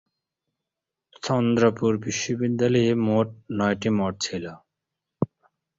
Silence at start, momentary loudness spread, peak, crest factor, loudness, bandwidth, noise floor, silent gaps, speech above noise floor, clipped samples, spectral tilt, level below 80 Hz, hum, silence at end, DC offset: 1.25 s; 10 LU; -6 dBFS; 20 dB; -24 LUFS; 7.8 kHz; -86 dBFS; none; 63 dB; under 0.1%; -5.5 dB/octave; -58 dBFS; none; 0.55 s; under 0.1%